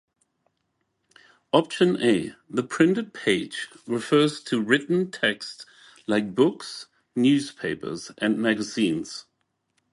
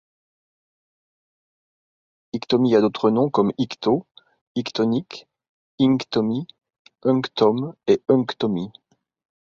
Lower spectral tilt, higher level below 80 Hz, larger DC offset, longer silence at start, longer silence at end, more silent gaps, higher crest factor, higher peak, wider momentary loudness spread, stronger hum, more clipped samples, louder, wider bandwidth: second, -5 dB/octave vs -7 dB/octave; about the same, -66 dBFS vs -64 dBFS; neither; second, 1.55 s vs 2.35 s; about the same, 0.7 s vs 0.75 s; second, none vs 4.41-4.55 s, 5.49-5.78 s, 6.79-6.85 s; about the same, 22 dB vs 18 dB; about the same, -4 dBFS vs -4 dBFS; about the same, 13 LU vs 13 LU; neither; neither; second, -24 LUFS vs -21 LUFS; first, 11.5 kHz vs 7.2 kHz